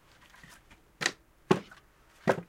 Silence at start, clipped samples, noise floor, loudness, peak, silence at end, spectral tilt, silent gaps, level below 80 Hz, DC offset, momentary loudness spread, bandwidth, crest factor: 1 s; under 0.1%; -60 dBFS; -32 LUFS; -6 dBFS; 0.05 s; -4.5 dB/octave; none; -66 dBFS; under 0.1%; 24 LU; 16.5 kHz; 28 dB